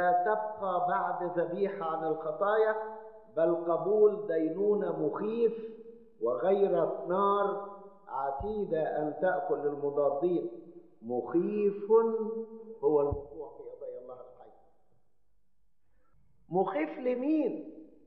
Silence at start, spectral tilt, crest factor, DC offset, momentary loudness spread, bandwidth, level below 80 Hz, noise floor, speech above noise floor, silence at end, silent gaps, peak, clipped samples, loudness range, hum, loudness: 0 s; -6.5 dB/octave; 16 dB; under 0.1%; 17 LU; 4.3 kHz; -60 dBFS; -79 dBFS; 49 dB; 0.2 s; none; -14 dBFS; under 0.1%; 7 LU; none; -31 LUFS